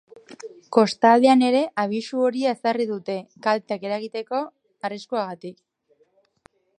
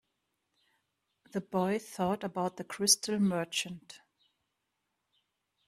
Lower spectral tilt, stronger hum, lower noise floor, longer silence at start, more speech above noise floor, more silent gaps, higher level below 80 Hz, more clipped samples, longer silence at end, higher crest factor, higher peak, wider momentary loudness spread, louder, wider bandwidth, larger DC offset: first, -5 dB/octave vs -3.5 dB/octave; neither; second, -64 dBFS vs -83 dBFS; second, 0.3 s vs 1.35 s; second, 42 dB vs 51 dB; neither; about the same, -76 dBFS vs -74 dBFS; neither; second, 1.25 s vs 1.7 s; about the same, 22 dB vs 26 dB; first, -2 dBFS vs -8 dBFS; first, 19 LU vs 15 LU; first, -22 LUFS vs -31 LUFS; second, 10.5 kHz vs 15.5 kHz; neither